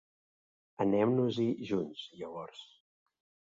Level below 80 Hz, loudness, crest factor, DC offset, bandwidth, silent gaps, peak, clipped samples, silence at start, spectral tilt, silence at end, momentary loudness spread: -72 dBFS; -33 LUFS; 18 dB; under 0.1%; 7.6 kHz; none; -16 dBFS; under 0.1%; 0.8 s; -7.5 dB/octave; 0.95 s; 17 LU